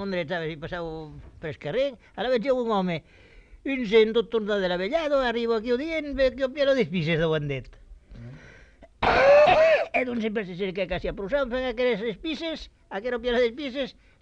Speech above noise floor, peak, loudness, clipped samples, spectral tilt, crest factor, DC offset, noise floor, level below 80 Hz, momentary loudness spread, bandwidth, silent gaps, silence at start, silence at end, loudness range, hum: 27 dB; -8 dBFS; -25 LUFS; under 0.1%; -6 dB/octave; 18 dB; under 0.1%; -52 dBFS; -48 dBFS; 15 LU; 8 kHz; none; 0 s; 0.3 s; 6 LU; none